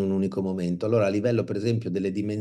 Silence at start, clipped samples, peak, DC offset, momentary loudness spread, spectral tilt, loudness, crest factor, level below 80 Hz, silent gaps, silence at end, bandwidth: 0 s; under 0.1%; -12 dBFS; under 0.1%; 5 LU; -8 dB/octave; -26 LUFS; 14 dB; -66 dBFS; none; 0 s; 11 kHz